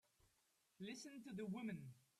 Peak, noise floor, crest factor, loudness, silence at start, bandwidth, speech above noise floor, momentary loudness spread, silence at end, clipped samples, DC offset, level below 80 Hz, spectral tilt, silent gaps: -40 dBFS; -83 dBFS; 14 dB; -52 LUFS; 0.8 s; 14 kHz; 31 dB; 7 LU; 0.2 s; under 0.1%; under 0.1%; -86 dBFS; -5.5 dB/octave; none